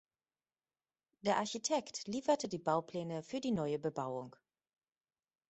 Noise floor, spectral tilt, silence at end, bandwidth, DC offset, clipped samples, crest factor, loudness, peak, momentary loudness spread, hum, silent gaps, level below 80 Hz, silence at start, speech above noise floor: under -90 dBFS; -4.5 dB/octave; 1.2 s; 8.2 kHz; under 0.1%; under 0.1%; 20 dB; -38 LUFS; -18 dBFS; 7 LU; none; none; -78 dBFS; 1.25 s; over 53 dB